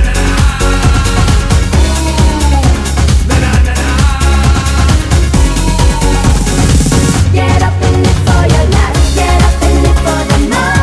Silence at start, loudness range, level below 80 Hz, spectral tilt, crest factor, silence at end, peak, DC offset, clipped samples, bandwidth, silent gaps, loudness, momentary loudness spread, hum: 0 s; 1 LU; -10 dBFS; -5 dB/octave; 8 dB; 0 s; 0 dBFS; 0.2%; 0.3%; 11 kHz; none; -10 LUFS; 2 LU; none